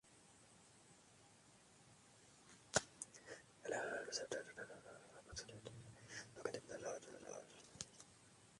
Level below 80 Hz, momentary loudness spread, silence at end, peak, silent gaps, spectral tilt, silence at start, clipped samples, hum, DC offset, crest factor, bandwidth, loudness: -76 dBFS; 21 LU; 0 s; -18 dBFS; none; -2 dB/octave; 0.05 s; under 0.1%; none; under 0.1%; 34 dB; 11.5 kHz; -49 LUFS